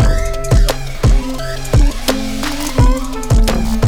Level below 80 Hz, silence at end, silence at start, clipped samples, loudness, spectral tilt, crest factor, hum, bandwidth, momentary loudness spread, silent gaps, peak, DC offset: -14 dBFS; 0 s; 0 s; under 0.1%; -16 LUFS; -5.5 dB/octave; 12 dB; none; 16.5 kHz; 6 LU; none; -2 dBFS; under 0.1%